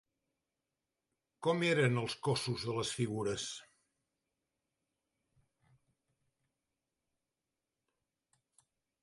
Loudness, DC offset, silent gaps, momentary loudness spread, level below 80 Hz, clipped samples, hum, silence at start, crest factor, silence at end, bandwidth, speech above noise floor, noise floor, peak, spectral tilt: -35 LUFS; under 0.1%; none; 9 LU; -72 dBFS; under 0.1%; none; 1.4 s; 22 dB; 5.4 s; 11.5 kHz; over 56 dB; under -90 dBFS; -18 dBFS; -5 dB/octave